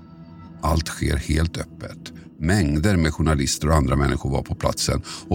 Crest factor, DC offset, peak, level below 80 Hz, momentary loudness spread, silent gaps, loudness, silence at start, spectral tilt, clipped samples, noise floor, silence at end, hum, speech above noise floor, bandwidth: 18 dB; under 0.1%; -4 dBFS; -30 dBFS; 17 LU; none; -22 LUFS; 0 s; -5.5 dB/octave; under 0.1%; -42 dBFS; 0 s; none; 20 dB; 17 kHz